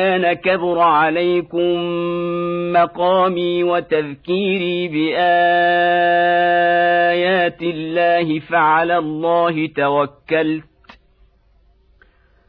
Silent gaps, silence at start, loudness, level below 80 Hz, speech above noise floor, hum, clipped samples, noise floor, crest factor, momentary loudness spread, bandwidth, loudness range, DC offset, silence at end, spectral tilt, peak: none; 0 s; -16 LUFS; -56 dBFS; 38 dB; none; under 0.1%; -55 dBFS; 14 dB; 7 LU; 5 kHz; 3 LU; under 0.1%; 1.85 s; -8.5 dB/octave; -4 dBFS